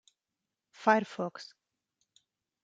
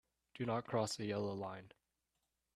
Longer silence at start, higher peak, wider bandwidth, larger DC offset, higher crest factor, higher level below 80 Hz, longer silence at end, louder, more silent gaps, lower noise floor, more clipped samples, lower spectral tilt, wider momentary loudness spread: first, 0.8 s vs 0.35 s; first, -10 dBFS vs -24 dBFS; second, 9 kHz vs 13 kHz; neither; first, 26 dB vs 20 dB; second, -88 dBFS vs -76 dBFS; first, 1.2 s vs 0.9 s; first, -30 LUFS vs -41 LUFS; neither; about the same, -89 dBFS vs -87 dBFS; neither; about the same, -5.5 dB/octave vs -5.5 dB/octave; first, 21 LU vs 9 LU